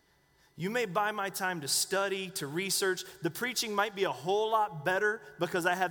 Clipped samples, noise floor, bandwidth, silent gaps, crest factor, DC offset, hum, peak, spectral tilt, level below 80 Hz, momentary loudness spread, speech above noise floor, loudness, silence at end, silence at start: under 0.1%; -67 dBFS; over 20 kHz; none; 18 dB; under 0.1%; none; -14 dBFS; -2.5 dB/octave; -74 dBFS; 6 LU; 35 dB; -31 LUFS; 0 s; 0.55 s